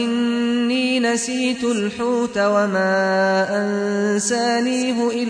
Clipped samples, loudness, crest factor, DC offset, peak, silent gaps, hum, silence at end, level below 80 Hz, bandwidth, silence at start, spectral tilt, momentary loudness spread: under 0.1%; -19 LUFS; 12 dB; under 0.1%; -6 dBFS; none; none; 0 s; -60 dBFS; 10.5 kHz; 0 s; -4 dB/octave; 3 LU